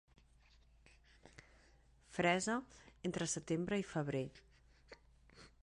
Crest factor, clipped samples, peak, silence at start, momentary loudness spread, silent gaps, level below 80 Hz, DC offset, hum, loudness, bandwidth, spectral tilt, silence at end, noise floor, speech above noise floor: 22 dB; under 0.1%; -20 dBFS; 1.25 s; 27 LU; none; -68 dBFS; under 0.1%; none; -39 LUFS; 11 kHz; -4.5 dB/octave; 0.2 s; -68 dBFS; 29 dB